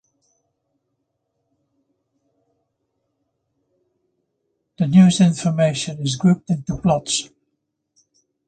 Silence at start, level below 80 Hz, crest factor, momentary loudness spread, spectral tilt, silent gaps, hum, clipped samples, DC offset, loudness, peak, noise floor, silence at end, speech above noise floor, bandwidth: 4.8 s; -52 dBFS; 20 dB; 11 LU; -6 dB/octave; none; none; under 0.1%; under 0.1%; -18 LUFS; -2 dBFS; -75 dBFS; 1.25 s; 58 dB; 9.2 kHz